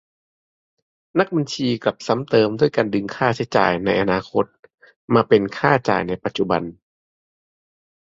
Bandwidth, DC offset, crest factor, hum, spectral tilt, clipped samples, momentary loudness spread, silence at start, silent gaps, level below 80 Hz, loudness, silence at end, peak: 7.8 kHz; under 0.1%; 20 dB; none; -6 dB/octave; under 0.1%; 7 LU; 1.15 s; 4.59-4.63 s, 4.96-5.08 s; -54 dBFS; -20 LUFS; 1.4 s; -2 dBFS